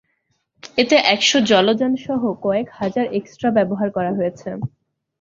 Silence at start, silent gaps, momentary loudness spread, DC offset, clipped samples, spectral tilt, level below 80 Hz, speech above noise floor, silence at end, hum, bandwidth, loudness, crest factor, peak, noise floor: 0.65 s; none; 10 LU; under 0.1%; under 0.1%; -4 dB/octave; -58 dBFS; 51 dB; 0.55 s; none; 7.8 kHz; -18 LUFS; 18 dB; 0 dBFS; -69 dBFS